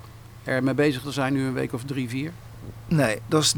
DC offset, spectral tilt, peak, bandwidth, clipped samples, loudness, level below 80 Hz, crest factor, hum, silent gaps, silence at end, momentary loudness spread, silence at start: under 0.1%; -4.5 dB/octave; -8 dBFS; over 20 kHz; under 0.1%; -25 LUFS; -52 dBFS; 18 dB; none; none; 0 s; 19 LU; 0 s